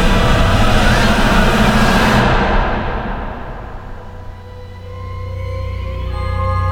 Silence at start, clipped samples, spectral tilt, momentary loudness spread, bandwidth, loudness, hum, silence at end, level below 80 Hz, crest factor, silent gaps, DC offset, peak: 0 s; under 0.1%; -5.5 dB/octave; 21 LU; 17 kHz; -15 LUFS; none; 0 s; -20 dBFS; 14 dB; none; under 0.1%; 0 dBFS